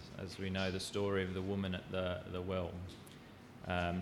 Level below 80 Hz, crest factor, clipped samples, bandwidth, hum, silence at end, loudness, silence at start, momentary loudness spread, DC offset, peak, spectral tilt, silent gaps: -62 dBFS; 18 dB; under 0.1%; 15 kHz; none; 0 s; -40 LUFS; 0 s; 15 LU; under 0.1%; -22 dBFS; -5.5 dB/octave; none